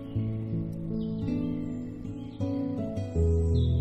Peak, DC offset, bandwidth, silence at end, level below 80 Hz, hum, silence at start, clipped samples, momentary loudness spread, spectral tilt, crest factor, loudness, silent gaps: -16 dBFS; under 0.1%; 8.2 kHz; 0 s; -40 dBFS; none; 0 s; under 0.1%; 11 LU; -9.5 dB/octave; 14 dB; -31 LUFS; none